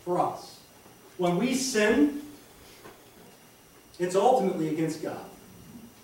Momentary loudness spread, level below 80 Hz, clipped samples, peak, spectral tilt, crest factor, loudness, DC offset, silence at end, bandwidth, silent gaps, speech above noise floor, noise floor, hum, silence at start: 25 LU; -62 dBFS; under 0.1%; -10 dBFS; -5 dB/octave; 20 dB; -26 LUFS; under 0.1%; 0.15 s; 17 kHz; none; 29 dB; -54 dBFS; none; 0.05 s